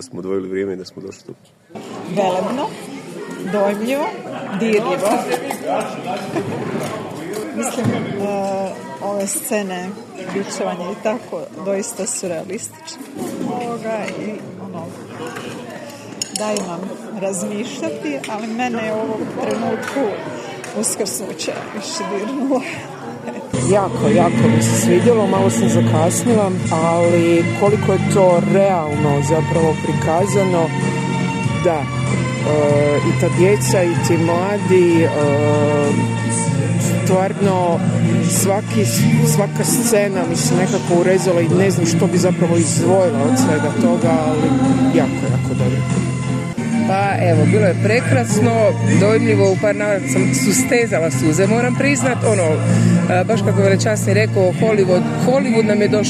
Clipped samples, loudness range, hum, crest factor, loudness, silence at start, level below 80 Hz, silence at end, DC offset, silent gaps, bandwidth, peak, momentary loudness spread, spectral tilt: under 0.1%; 9 LU; none; 16 dB; -17 LUFS; 0 s; -54 dBFS; 0 s; under 0.1%; none; 14 kHz; 0 dBFS; 13 LU; -5.5 dB/octave